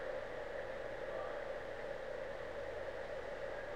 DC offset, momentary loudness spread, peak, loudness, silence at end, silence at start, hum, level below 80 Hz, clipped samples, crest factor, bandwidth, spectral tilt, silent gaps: 0.2%; 2 LU; -32 dBFS; -45 LUFS; 0 s; 0 s; 60 Hz at -70 dBFS; -60 dBFS; under 0.1%; 12 dB; 13 kHz; -5 dB/octave; none